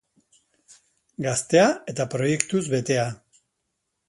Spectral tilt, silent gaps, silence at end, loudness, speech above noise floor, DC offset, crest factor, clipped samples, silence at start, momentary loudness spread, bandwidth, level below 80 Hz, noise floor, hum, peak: -4.5 dB/octave; none; 0.95 s; -23 LUFS; 55 dB; under 0.1%; 24 dB; under 0.1%; 1.2 s; 12 LU; 11.5 kHz; -64 dBFS; -78 dBFS; none; -2 dBFS